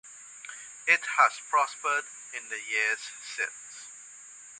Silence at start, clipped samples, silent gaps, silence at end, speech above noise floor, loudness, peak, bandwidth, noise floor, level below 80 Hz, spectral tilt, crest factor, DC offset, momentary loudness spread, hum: 0.05 s; under 0.1%; none; 0 s; 20 dB; -27 LUFS; -6 dBFS; 11.5 kHz; -49 dBFS; -88 dBFS; 1.5 dB/octave; 24 dB; under 0.1%; 20 LU; none